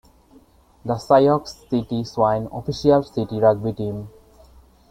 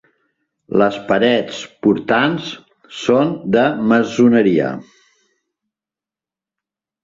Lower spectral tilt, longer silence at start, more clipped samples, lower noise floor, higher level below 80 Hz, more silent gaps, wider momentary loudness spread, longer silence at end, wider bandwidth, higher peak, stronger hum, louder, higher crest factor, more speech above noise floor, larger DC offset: first, -7.5 dB/octave vs -6 dB/octave; first, 0.85 s vs 0.7 s; neither; second, -53 dBFS vs -89 dBFS; first, -50 dBFS vs -58 dBFS; neither; about the same, 13 LU vs 14 LU; second, 0.8 s vs 2.2 s; first, 15 kHz vs 7.6 kHz; about the same, -2 dBFS vs -2 dBFS; neither; second, -20 LUFS vs -16 LUFS; about the same, 20 dB vs 16 dB; second, 33 dB vs 74 dB; neither